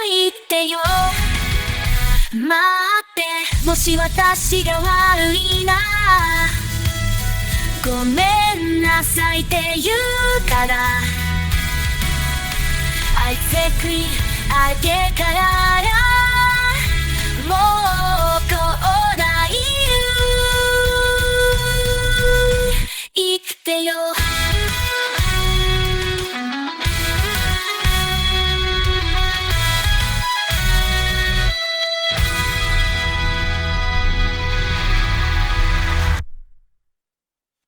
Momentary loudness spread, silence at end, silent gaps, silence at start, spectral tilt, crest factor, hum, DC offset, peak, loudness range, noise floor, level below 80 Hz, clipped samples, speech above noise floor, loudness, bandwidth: 6 LU; 1.15 s; none; 0 s; -3.5 dB/octave; 14 dB; none; under 0.1%; -2 dBFS; 4 LU; -89 dBFS; -22 dBFS; under 0.1%; 73 dB; -17 LUFS; over 20 kHz